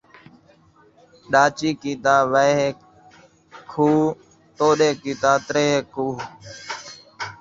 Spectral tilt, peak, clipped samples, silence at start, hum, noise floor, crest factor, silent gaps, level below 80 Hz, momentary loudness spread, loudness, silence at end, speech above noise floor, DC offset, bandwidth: -4.5 dB/octave; -2 dBFS; under 0.1%; 1.3 s; none; -54 dBFS; 20 dB; none; -60 dBFS; 16 LU; -20 LUFS; 0.05 s; 35 dB; under 0.1%; 7.8 kHz